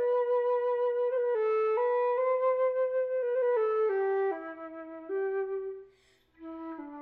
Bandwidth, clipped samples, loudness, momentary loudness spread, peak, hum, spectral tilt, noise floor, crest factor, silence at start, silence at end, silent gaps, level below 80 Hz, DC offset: 4.2 kHz; under 0.1%; -29 LUFS; 15 LU; -20 dBFS; none; -6.5 dB/octave; -65 dBFS; 10 dB; 0 s; 0 s; none; -76 dBFS; under 0.1%